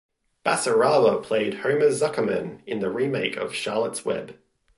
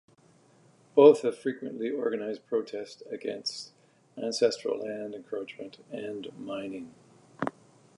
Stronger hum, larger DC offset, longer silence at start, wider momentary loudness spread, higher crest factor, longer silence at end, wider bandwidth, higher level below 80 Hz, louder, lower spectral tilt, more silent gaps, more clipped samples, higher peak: neither; neither; second, 0.45 s vs 0.95 s; second, 10 LU vs 20 LU; second, 16 dB vs 24 dB; about the same, 0.45 s vs 0.5 s; about the same, 11.5 kHz vs 11 kHz; first, -66 dBFS vs -80 dBFS; first, -24 LUFS vs -29 LUFS; about the same, -4 dB/octave vs -4.5 dB/octave; neither; neither; about the same, -8 dBFS vs -6 dBFS